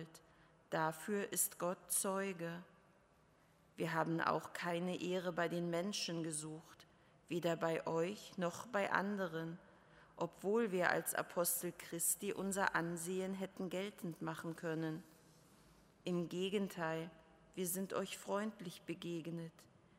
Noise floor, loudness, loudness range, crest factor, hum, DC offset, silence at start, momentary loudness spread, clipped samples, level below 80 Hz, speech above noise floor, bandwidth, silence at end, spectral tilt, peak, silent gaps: -71 dBFS; -41 LUFS; 5 LU; 24 dB; none; under 0.1%; 0 s; 10 LU; under 0.1%; -80 dBFS; 30 dB; 16 kHz; 0.35 s; -4 dB/octave; -18 dBFS; none